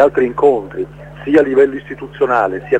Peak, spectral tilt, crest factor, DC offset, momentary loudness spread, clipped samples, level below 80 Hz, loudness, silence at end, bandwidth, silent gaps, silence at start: 0 dBFS; -7.5 dB/octave; 14 dB; under 0.1%; 15 LU; under 0.1%; -44 dBFS; -14 LUFS; 0 s; 8 kHz; none; 0 s